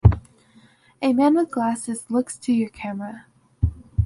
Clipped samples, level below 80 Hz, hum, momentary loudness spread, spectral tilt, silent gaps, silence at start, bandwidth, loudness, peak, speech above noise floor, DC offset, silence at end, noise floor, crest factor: under 0.1%; -32 dBFS; none; 13 LU; -7.5 dB/octave; none; 0.05 s; 11.5 kHz; -23 LUFS; -2 dBFS; 32 dB; under 0.1%; 0 s; -54 dBFS; 22 dB